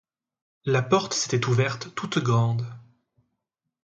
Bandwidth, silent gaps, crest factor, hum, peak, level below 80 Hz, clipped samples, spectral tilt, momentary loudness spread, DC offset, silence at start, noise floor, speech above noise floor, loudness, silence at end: 9 kHz; none; 20 dB; none; -8 dBFS; -62 dBFS; under 0.1%; -5 dB/octave; 10 LU; under 0.1%; 0.65 s; -82 dBFS; 58 dB; -25 LUFS; 1.05 s